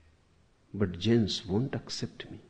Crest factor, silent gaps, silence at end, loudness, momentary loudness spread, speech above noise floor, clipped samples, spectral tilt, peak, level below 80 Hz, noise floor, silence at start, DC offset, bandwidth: 18 dB; none; 0.1 s; -31 LUFS; 12 LU; 35 dB; under 0.1%; -6 dB/octave; -14 dBFS; -58 dBFS; -65 dBFS; 0.75 s; under 0.1%; 9.6 kHz